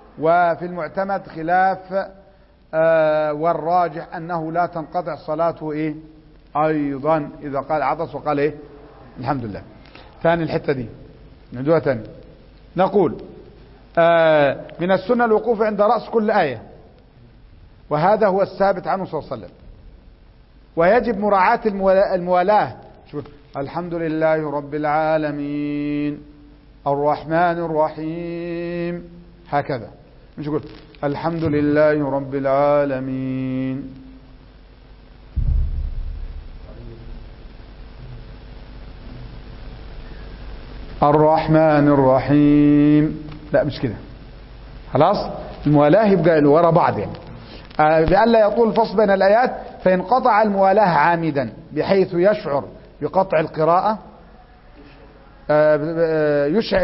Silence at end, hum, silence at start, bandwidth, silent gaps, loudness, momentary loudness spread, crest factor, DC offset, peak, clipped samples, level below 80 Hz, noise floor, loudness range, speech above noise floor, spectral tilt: 0 s; none; 0.15 s; 5.8 kHz; none; -19 LUFS; 21 LU; 16 dB; under 0.1%; -2 dBFS; under 0.1%; -38 dBFS; -50 dBFS; 11 LU; 32 dB; -11.5 dB/octave